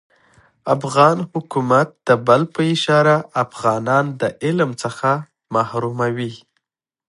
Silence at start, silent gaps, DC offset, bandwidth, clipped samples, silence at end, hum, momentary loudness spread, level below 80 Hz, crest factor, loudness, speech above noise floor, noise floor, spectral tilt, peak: 0.65 s; none; under 0.1%; 11.5 kHz; under 0.1%; 0.75 s; none; 9 LU; -62 dBFS; 18 dB; -18 LUFS; 62 dB; -79 dBFS; -6 dB/octave; 0 dBFS